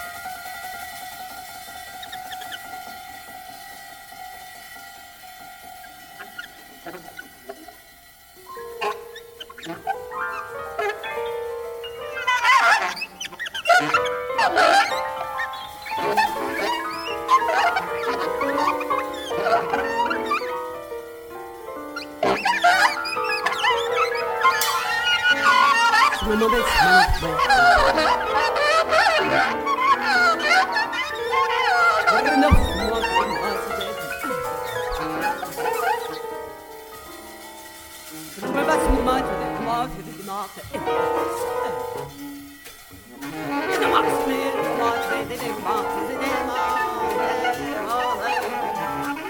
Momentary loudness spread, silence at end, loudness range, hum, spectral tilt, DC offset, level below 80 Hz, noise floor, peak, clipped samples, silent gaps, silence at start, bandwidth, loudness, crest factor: 21 LU; 0 s; 18 LU; none; -3.5 dB/octave; under 0.1%; -38 dBFS; -48 dBFS; -2 dBFS; under 0.1%; none; 0 s; 17.5 kHz; -21 LUFS; 20 dB